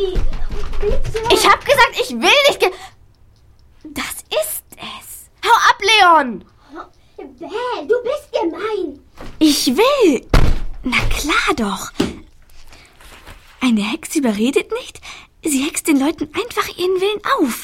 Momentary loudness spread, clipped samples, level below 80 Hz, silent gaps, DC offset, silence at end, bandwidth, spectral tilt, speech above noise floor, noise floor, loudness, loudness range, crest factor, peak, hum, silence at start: 18 LU; under 0.1%; -26 dBFS; none; under 0.1%; 0 s; 16.5 kHz; -3.5 dB/octave; 32 dB; -48 dBFS; -16 LUFS; 6 LU; 16 dB; 0 dBFS; none; 0 s